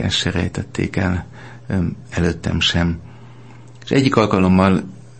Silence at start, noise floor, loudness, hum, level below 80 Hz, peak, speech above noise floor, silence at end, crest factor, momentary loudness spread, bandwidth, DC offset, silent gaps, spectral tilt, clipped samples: 0 s; -41 dBFS; -18 LUFS; none; -38 dBFS; 0 dBFS; 23 dB; 0.2 s; 18 dB; 11 LU; 8.8 kHz; 0.6%; none; -5.5 dB/octave; under 0.1%